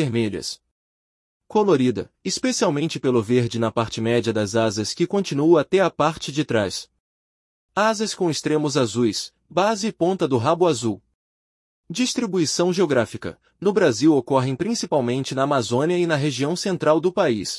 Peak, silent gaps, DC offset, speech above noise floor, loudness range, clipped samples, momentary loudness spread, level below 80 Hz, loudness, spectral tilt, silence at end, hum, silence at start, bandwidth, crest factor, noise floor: -4 dBFS; 0.71-1.40 s, 7.00-7.69 s, 11.15-11.84 s; under 0.1%; over 69 dB; 2 LU; under 0.1%; 8 LU; -60 dBFS; -21 LUFS; -5 dB/octave; 0 s; none; 0 s; 12 kHz; 18 dB; under -90 dBFS